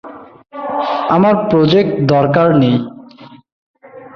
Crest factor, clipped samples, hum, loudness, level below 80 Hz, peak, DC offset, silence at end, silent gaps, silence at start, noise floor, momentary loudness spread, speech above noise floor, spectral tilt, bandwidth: 14 dB; under 0.1%; none; -13 LUFS; -50 dBFS; 0 dBFS; under 0.1%; 0.1 s; 3.52-3.74 s; 0.05 s; -39 dBFS; 13 LU; 28 dB; -8.5 dB/octave; 6.6 kHz